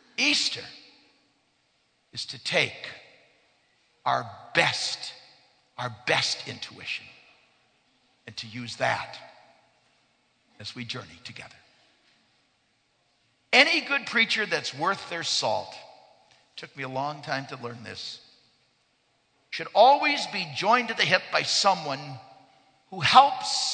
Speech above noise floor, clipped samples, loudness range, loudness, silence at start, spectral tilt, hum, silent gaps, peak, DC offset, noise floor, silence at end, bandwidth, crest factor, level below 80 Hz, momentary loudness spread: 43 dB; under 0.1%; 13 LU; -25 LUFS; 0.2 s; -2 dB/octave; none; none; -2 dBFS; under 0.1%; -70 dBFS; 0 s; 9.4 kHz; 28 dB; -72 dBFS; 23 LU